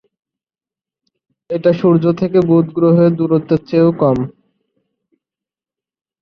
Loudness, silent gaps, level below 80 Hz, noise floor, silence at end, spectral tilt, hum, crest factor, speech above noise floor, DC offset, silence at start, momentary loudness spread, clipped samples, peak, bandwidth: -14 LUFS; none; -52 dBFS; under -90 dBFS; 1.9 s; -10.5 dB/octave; none; 14 dB; over 77 dB; under 0.1%; 1.5 s; 5 LU; under 0.1%; -2 dBFS; 6 kHz